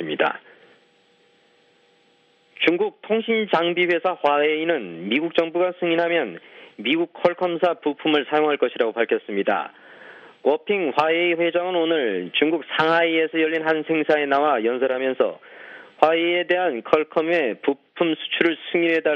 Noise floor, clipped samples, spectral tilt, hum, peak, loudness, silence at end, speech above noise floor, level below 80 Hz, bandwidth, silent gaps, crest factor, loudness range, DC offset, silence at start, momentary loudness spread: -60 dBFS; under 0.1%; -6.5 dB/octave; none; 0 dBFS; -21 LUFS; 0 s; 39 dB; -72 dBFS; 6.6 kHz; none; 22 dB; 2 LU; under 0.1%; 0 s; 5 LU